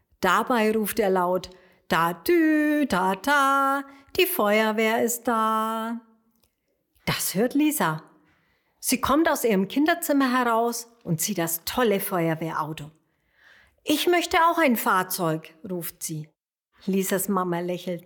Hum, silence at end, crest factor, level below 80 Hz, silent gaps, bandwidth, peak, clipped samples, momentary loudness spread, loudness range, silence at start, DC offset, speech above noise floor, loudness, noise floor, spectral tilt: none; 0.05 s; 18 dB; -58 dBFS; none; 19 kHz; -6 dBFS; under 0.1%; 12 LU; 5 LU; 0.2 s; under 0.1%; 50 dB; -24 LUFS; -73 dBFS; -4 dB/octave